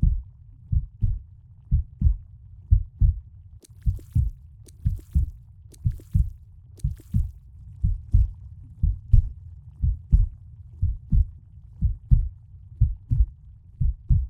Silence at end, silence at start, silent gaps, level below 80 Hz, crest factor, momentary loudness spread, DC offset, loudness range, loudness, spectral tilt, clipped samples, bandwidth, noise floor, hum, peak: 0 s; 0 s; none; -26 dBFS; 22 dB; 21 LU; under 0.1%; 3 LU; -27 LUFS; -10 dB/octave; under 0.1%; 0.5 kHz; -48 dBFS; none; -4 dBFS